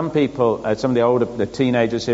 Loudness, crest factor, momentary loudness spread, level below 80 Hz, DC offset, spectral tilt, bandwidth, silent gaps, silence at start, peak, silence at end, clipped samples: -19 LUFS; 14 dB; 4 LU; -50 dBFS; under 0.1%; -5.5 dB/octave; 8 kHz; none; 0 s; -4 dBFS; 0 s; under 0.1%